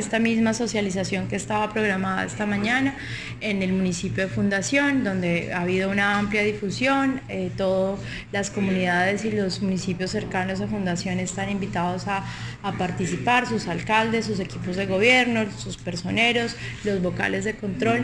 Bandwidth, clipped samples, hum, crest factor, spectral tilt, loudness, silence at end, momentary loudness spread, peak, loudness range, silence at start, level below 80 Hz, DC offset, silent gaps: 10.5 kHz; under 0.1%; none; 20 dB; -5 dB/octave; -24 LUFS; 0 s; 8 LU; -4 dBFS; 3 LU; 0 s; -48 dBFS; 0.1%; none